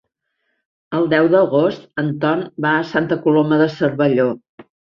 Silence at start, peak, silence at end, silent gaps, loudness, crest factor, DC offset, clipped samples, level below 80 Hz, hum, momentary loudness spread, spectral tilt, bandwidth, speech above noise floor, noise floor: 0.9 s; -2 dBFS; 0.25 s; 4.49-4.58 s; -17 LUFS; 16 dB; under 0.1%; under 0.1%; -60 dBFS; none; 8 LU; -8.5 dB/octave; 6.6 kHz; 55 dB; -72 dBFS